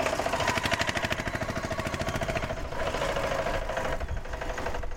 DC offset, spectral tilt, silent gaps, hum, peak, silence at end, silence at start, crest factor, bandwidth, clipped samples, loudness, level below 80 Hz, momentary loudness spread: under 0.1%; -4 dB/octave; none; none; -10 dBFS; 0 s; 0 s; 20 dB; 16.5 kHz; under 0.1%; -30 LUFS; -38 dBFS; 7 LU